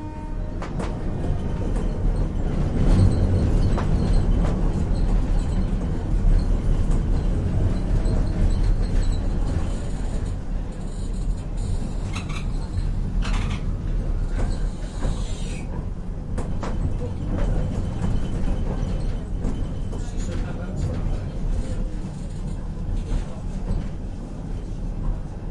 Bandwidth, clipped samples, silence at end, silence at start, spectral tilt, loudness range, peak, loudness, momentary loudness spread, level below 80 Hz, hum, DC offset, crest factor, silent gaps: 10.5 kHz; under 0.1%; 0 s; 0 s; -7.5 dB/octave; 7 LU; -6 dBFS; -27 LUFS; 9 LU; -24 dBFS; none; under 0.1%; 18 dB; none